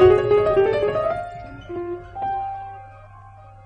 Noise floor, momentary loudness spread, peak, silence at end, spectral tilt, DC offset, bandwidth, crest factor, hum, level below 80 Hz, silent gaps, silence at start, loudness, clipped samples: -44 dBFS; 18 LU; -4 dBFS; 0.15 s; -8 dB/octave; under 0.1%; 5.6 kHz; 18 dB; none; -44 dBFS; none; 0 s; -21 LUFS; under 0.1%